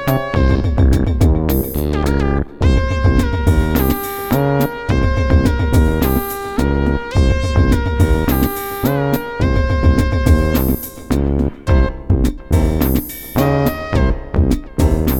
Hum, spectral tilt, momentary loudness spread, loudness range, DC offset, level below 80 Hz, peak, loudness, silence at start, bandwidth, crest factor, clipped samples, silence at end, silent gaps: none; -7 dB/octave; 5 LU; 1 LU; under 0.1%; -18 dBFS; 0 dBFS; -16 LUFS; 0 s; 18 kHz; 14 dB; under 0.1%; 0 s; none